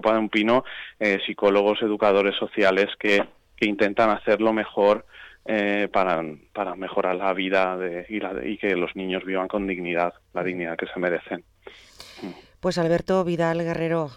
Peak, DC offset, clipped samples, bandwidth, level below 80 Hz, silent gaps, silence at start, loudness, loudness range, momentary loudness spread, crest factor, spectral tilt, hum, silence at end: -8 dBFS; under 0.1%; under 0.1%; 10.5 kHz; -56 dBFS; none; 0 s; -23 LUFS; 6 LU; 10 LU; 16 dB; -6 dB/octave; none; 0 s